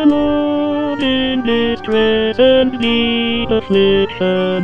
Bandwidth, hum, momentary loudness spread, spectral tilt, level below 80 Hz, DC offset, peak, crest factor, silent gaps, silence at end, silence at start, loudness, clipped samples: 7.4 kHz; none; 5 LU; -7 dB/octave; -38 dBFS; 2%; 0 dBFS; 12 dB; none; 0 s; 0 s; -14 LUFS; under 0.1%